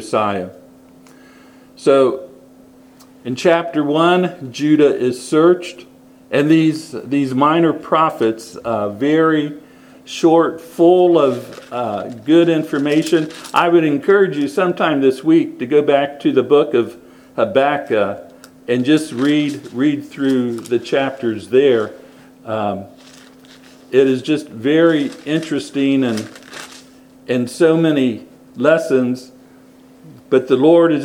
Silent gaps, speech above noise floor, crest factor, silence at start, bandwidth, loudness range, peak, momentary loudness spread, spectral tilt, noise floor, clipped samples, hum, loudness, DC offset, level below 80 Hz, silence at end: none; 30 dB; 16 dB; 0 s; 14.5 kHz; 4 LU; 0 dBFS; 13 LU; -6 dB/octave; -45 dBFS; under 0.1%; none; -16 LUFS; under 0.1%; -64 dBFS; 0 s